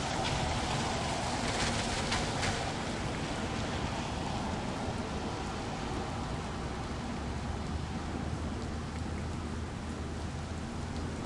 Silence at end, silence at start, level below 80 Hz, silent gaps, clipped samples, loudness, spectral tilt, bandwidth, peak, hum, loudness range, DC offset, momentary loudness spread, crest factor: 0 s; 0 s; -44 dBFS; none; under 0.1%; -35 LUFS; -4.5 dB/octave; 11.5 kHz; -16 dBFS; none; 5 LU; under 0.1%; 7 LU; 18 dB